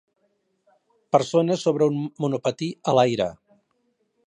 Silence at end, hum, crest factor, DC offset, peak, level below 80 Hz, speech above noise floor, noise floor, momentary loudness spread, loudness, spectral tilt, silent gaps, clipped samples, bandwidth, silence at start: 0.95 s; none; 22 dB; under 0.1%; -4 dBFS; -66 dBFS; 49 dB; -71 dBFS; 7 LU; -23 LUFS; -6 dB/octave; none; under 0.1%; 10.5 kHz; 1.15 s